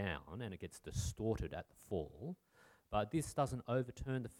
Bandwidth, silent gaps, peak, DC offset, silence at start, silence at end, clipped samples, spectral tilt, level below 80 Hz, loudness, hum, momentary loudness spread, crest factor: 17 kHz; none; -22 dBFS; under 0.1%; 0 s; 0 s; under 0.1%; -6 dB/octave; -56 dBFS; -42 LUFS; none; 12 LU; 20 dB